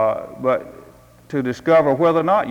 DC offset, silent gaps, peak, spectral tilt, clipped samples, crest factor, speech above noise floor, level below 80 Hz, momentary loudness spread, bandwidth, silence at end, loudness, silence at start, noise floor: under 0.1%; none; -6 dBFS; -7.5 dB/octave; under 0.1%; 14 dB; 28 dB; -56 dBFS; 9 LU; 14.5 kHz; 0 s; -19 LUFS; 0 s; -46 dBFS